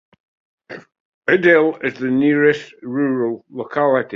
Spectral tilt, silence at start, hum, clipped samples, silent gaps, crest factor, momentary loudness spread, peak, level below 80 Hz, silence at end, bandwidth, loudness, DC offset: -7.5 dB/octave; 0.7 s; none; under 0.1%; 1.00-1.22 s; 16 dB; 22 LU; -2 dBFS; -64 dBFS; 0 s; 7.4 kHz; -17 LUFS; under 0.1%